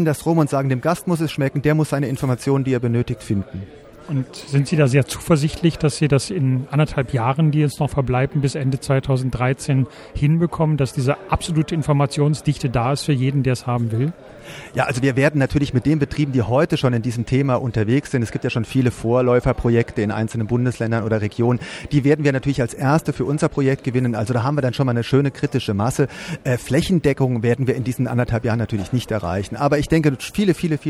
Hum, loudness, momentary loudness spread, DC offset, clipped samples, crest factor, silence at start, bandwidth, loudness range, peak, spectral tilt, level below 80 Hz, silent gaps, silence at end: none; -20 LUFS; 5 LU; under 0.1%; under 0.1%; 18 dB; 0 s; 13.5 kHz; 2 LU; -2 dBFS; -7 dB/octave; -40 dBFS; none; 0 s